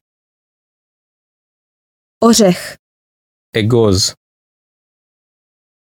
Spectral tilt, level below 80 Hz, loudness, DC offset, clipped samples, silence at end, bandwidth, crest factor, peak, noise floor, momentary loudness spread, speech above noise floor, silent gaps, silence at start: -4.5 dB/octave; -50 dBFS; -13 LUFS; under 0.1%; under 0.1%; 1.9 s; 18 kHz; 18 dB; 0 dBFS; under -90 dBFS; 12 LU; over 79 dB; 2.79-3.53 s; 2.2 s